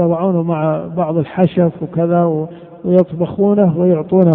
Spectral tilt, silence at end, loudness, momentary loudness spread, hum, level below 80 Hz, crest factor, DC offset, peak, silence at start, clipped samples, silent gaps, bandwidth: -12.5 dB/octave; 0 s; -15 LUFS; 6 LU; none; -52 dBFS; 14 dB; under 0.1%; 0 dBFS; 0 s; under 0.1%; none; 3.8 kHz